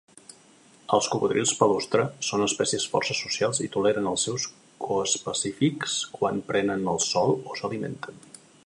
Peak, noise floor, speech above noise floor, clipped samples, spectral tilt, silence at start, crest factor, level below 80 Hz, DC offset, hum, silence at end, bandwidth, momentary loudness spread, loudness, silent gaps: -4 dBFS; -55 dBFS; 30 dB; under 0.1%; -3.5 dB/octave; 0.9 s; 22 dB; -64 dBFS; under 0.1%; none; 0.5 s; 11.5 kHz; 9 LU; -26 LUFS; none